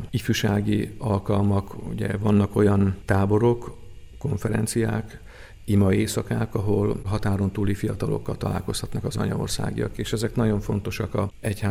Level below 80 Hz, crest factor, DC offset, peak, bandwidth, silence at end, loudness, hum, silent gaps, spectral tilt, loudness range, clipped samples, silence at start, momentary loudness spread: -42 dBFS; 18 dB; under 0.1%; -6 dBFS; 15.5 kHz; 0 s; -25 LUFS; none; none; -6.5 dB/octave; 4 LU; under 0.1%; 0 s; 9 LU